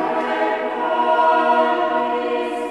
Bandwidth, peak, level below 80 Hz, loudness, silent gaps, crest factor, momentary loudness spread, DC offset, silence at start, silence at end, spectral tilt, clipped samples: 11 kHz; -6 dBFS; -66 dBFS; -19 LUFS; none; 14 dB; 6 LU; 0.1%; 0 s; 0 s; -4.5 dB/octave; under 0.1%